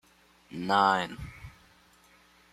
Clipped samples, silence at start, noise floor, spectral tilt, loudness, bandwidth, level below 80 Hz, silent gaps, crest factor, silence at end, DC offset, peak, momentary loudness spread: under 0.1%; 0.5 s; -61 dBFS; -5 dB/octave; -27 LUFS; 14.5 kHz; -56 dBFS; none; 22 dB; 1.05 s; under 0.1%; -10 dBFS; 25 LU